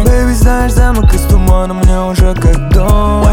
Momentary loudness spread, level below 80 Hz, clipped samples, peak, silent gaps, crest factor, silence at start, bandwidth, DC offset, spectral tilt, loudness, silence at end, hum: 2 LU; -10 dBFS; 0.2%; 0 dBFS; none; 8 dB; 0 s; 18.5 kHz; under 0.1%; -6.5 dB/octave; -11 LUFS; 0 s; none